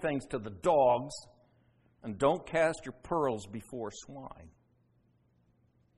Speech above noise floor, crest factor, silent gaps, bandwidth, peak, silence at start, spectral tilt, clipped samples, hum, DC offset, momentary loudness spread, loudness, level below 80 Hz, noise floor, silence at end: 38 dB; 20 dB; none; 11.5 kHz; -14 dBFS; 0 s; -5.5 dB/octave; under 0.1%; none; under 0.1%; 20 LU; -31 LUFS; -62 dBFS; -70 dBFS; 1.5 s